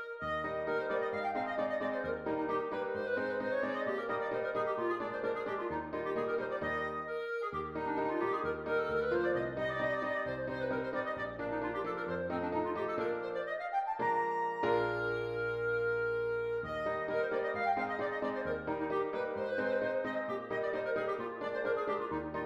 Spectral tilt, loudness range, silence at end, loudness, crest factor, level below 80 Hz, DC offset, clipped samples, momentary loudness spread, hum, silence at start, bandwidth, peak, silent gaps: -7 dB/octave; 2 LU; 0 s; -35 LUFS; 16 dB; -62 dBFS; under 0.1%; under 0.1%; 4 LU; none; 0 s; 7.8 kHz; -20 dBFS; none